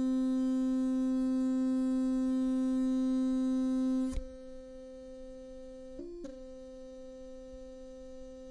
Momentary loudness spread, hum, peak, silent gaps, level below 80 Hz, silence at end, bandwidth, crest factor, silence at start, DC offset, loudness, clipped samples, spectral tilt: 18 LU; none; -24 dBFS; none; -52 dBFS; 0 s; 10.5 kHz; 10 dB; 0 s; under 0.1%; -31 LUFS; under 0.1%; -6.5 dB/octave